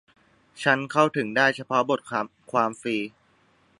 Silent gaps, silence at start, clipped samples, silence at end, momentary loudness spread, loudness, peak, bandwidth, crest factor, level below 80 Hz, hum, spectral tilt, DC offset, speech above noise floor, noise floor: none; 0.55 s; under 0.1%; 0.7 s; 9 LU; -24 LUFS; -4 dBFS; 11.5 kHz; 22 dB; -72 dBFS; none; -5 dB/octave; under 0.1%; 38 dB; -63 dBFS